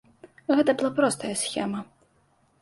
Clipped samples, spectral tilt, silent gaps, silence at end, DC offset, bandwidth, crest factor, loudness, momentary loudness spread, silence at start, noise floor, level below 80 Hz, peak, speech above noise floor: under 0.1%; -4 dB/octave; none; 0.75 s; under 0.1%; 12 kHz; 18 dB; -25 LUFS; 11 LU; 0.25 s; -65 dBFS; -68 dBFS; -8 dBFS; 40 dB